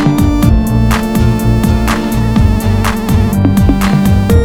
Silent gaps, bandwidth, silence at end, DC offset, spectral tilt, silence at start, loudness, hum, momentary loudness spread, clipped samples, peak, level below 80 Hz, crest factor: none; 17.5 kHz; 0 s; 0.4%; -7 dB/octave; 0 s; -11 LUFS; none; 3 LU; 0.1%; 0 dBFS; -16 dBFS; 10 dB